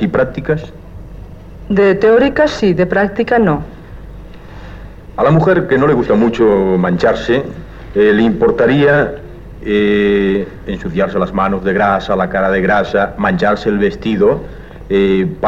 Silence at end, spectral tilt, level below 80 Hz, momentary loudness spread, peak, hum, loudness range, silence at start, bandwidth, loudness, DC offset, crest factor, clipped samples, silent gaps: 0 s; -7.5 dB/octave; -34 dBFS; 21 LU; -2 dBFS; none; 2 LU; 0 s; 7.6 kHz; -13 LUFS; 0.7%; 10 dB; under 0.1%; none